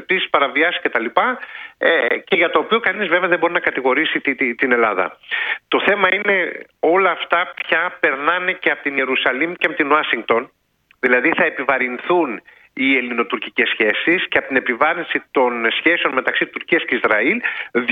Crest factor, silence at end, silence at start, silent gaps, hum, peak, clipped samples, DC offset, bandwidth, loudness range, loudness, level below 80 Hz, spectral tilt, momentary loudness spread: 18 dB; 0 s; 0 s; none; none; 0 dBFS; under 0.1%; under 0.1%; 5 kHz; 1 LU; -17 LUFS; -66 dBFS; -6 dB/octave; 6 LU